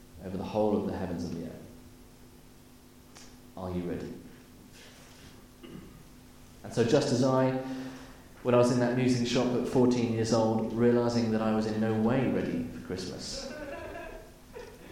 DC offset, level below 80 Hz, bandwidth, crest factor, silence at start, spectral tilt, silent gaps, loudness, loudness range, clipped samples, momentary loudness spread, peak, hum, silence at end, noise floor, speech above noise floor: under 0.1%; -56 dBFS; 16 kHz; 18 dB; 0 s; -6 dB/octave; none; -29 LUFS; 16 LU; under 0.1%; 23 LU; -12 dBFS; none; 0 s; -54 dBFS; 26 dB